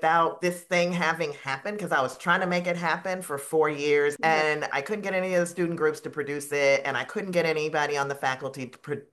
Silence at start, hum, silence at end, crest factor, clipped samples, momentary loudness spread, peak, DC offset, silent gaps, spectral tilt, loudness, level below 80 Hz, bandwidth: 0 s; none; 0.1 s; 18 dB; under 0.1%; 9 LU; -8 dBFS; under 0.1%; none; -4.5 dB/octave; -26 LUFS; -76 dBFS; 12.5 kHz